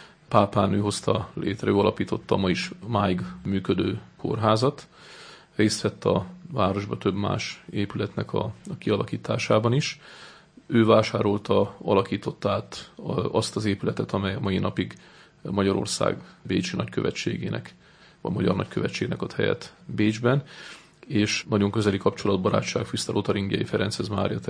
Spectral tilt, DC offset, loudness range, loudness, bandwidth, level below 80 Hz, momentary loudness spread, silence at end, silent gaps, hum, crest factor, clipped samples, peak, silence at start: -6 dB/octave; under 0.1%; 4 LU; -26 LUFS; 10.5 kHz; -58 dBFS; 10 LU; 0 s; none; none; 22 dB; under 0.1%; -2 dBFS; 0 s